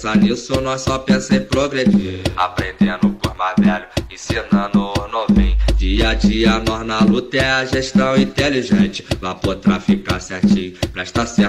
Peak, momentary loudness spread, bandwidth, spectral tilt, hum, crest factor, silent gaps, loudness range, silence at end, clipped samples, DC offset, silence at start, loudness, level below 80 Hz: -4 dBFS; 7 LU; 12.5 kHz; -5.5 dB/octave; none; 12 dB; none; 2 LU; 0 s; under 0.1%; 0.2%; 0 s; -17 LUFS; -26 dBFS